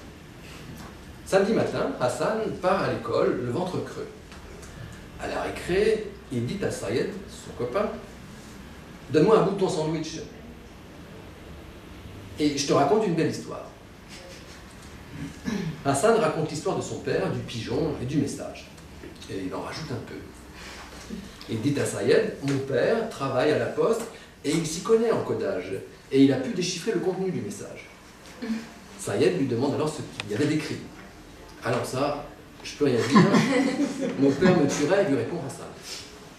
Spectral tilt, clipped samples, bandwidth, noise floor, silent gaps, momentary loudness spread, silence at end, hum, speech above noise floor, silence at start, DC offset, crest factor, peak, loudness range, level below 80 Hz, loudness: -5.5 dB/octave; under 0.1%; 15 kHz; -46 dBFS; none; 22 LU; 0 s; none; 21 dB; 0 s; under 0.1%; 22 dB; -4 dBFS; 7 LU; -52 dBFS; -26 LUFS